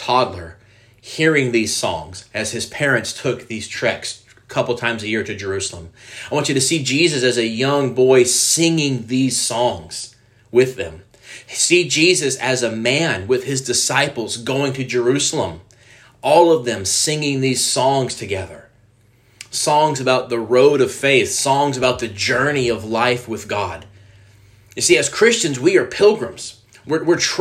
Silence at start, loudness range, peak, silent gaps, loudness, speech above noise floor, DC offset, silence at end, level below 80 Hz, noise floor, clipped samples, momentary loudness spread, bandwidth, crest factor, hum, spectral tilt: 0 s; 5 LU; 0 dBFS; none; -17 LUFS; 36 dB; under 0.1%; 0 s; -56 dBFS; -54 dBFS; under 0.1%; 13 LU; 15.5 kHz; 18 dB; none; -3.5 dB/octave